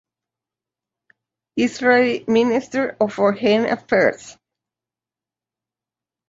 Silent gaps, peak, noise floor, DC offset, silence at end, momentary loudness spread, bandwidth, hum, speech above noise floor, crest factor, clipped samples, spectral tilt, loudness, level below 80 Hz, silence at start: none; -4 dBFS; -90 dBFS; under 0.1%; 2 s; 7 LU; 8 kHz; none; 72 dB; 18 dB; under 0.1%; -5 dB/octave; -18 LUFS; -62 dBFS; 1.55 s